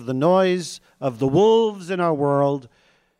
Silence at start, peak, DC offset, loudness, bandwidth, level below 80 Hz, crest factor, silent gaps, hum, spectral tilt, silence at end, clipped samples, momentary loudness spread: 0 s; -8 dBFS; under 0.1%; -20 LUFS; 12 kHz; -60 dBFS; 12 dB; none; none; -6.5 dB/octave; 0.55 s; under 0.1%; 12 LU